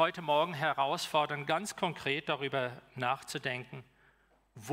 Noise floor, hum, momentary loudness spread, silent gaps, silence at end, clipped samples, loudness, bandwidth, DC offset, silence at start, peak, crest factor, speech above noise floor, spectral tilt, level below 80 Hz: -68 dBFS; none; 9 LU; none; 0 s; under 0.1%; -33 LUFS; 16 kHz; under 0.1%; 0 s; -16 dBFS; 18 dB; 35 dB; -4 dB/octave; -74 dBFS